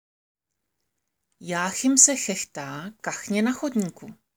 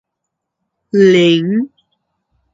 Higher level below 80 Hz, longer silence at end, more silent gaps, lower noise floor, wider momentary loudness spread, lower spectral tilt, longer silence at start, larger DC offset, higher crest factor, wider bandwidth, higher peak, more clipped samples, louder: second, -72 dBFS vs -64 dBFS; second, 0.2 s vs 0.9 s; neither; first, -81 dBFS vs -77 dBFS; first, 18 LU vs 10 LU; second, -2.5 dB/octave vs -6.5 dB/octave; first, 1.4 s vs 0.95 s; neither; first, 26 dB vs 16 dB; first, over 20 kHz vs 7.6 kHz; about the same, -2 dBFS vs 0 dBFS; neither; second, -22 LUFS vs -12 LUFS